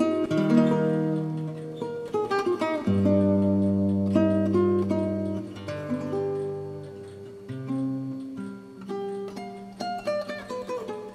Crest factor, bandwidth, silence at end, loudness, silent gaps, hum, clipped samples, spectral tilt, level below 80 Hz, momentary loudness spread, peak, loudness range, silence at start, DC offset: 20 dB; 11 kHz; 0 s; -27 LUFS; none; none; under 0.1%; -8 dB/octave; -66 dBFS; 16 LU; -8 dBFS; 10 LU; 0 s; under 0.1%